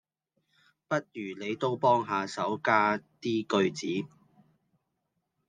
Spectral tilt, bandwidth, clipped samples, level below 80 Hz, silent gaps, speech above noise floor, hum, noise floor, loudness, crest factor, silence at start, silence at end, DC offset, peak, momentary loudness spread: -5.5 dB/octave; 9.8 kHz; under 0.1%; -78 dBFS; none; 52 dB; none; -81 dBFS; -29 LUFS; 22 dB; 0.9 s; 1.4 s; under 0.1%; -10 dBFS; 10 LU